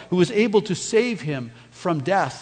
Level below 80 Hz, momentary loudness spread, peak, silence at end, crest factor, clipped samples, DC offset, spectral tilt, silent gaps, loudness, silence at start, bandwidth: -62 dBFS; 11 LU; -6 dBFS; 0 s; 16 dB; under 0.1%; under 0.1%; -5.5 dB/octave; none; -22 LUFS; 0 s; 9.4 kHz